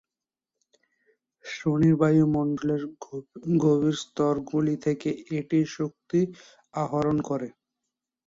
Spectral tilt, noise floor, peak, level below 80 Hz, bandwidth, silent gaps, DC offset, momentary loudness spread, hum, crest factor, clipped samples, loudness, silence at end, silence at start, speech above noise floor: -7.5 dB/octave; under -90 dBFS; -10 dBFS; -60 dBFS; 7.8 kHz; none; under 0.1%; 16 LU; none; 16 dB; under 0.1%; -26 LUFS; 0.8 s; 1.45 s; over 65 dB